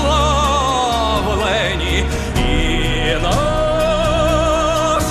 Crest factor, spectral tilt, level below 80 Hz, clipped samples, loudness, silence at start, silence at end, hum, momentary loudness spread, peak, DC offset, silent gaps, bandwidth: 12 dB; -4.5 dB/octave; -22 dBFS; under 0.1%; -16 LUFS; 0 s; 0 s; none; 3 LU; -4 dBFS; under 0.1%; none; 14.5 kHz